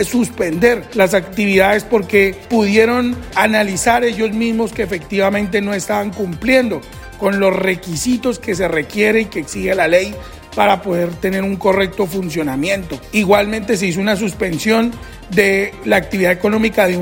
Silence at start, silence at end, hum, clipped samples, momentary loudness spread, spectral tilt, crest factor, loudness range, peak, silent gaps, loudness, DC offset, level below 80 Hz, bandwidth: 0 s; 0 s; none; under 0.1%; 7 LU; -5 dB/octave; 16 dB; 3 LU; 0 dBFS; none; -16 LUFS; under 0.1%; -40 dBFS; 16.5 kHz